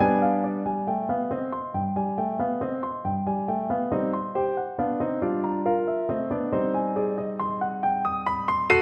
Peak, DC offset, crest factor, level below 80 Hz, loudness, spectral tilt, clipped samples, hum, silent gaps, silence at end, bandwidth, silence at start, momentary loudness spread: -6 dBFS; under 0.1%; 18 dB; -56 dBFS; -26 LUFS; -8.5 dB/octave; under 0.1%; none; none; 0 s; 8.2 kHz; 0 s; 4 LU